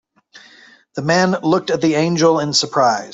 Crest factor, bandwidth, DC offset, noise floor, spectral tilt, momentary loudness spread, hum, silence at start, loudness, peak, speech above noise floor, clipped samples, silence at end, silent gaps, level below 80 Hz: 16 dB; 8.2 kHz; under 0.1%; -47 dBFS; -4.5 dB/octave; 3 LU; none; 0.35 s; -16 LUFS; -2 dBFS; 31 dB; under 0.1%; 0 s; none; -60 dBFS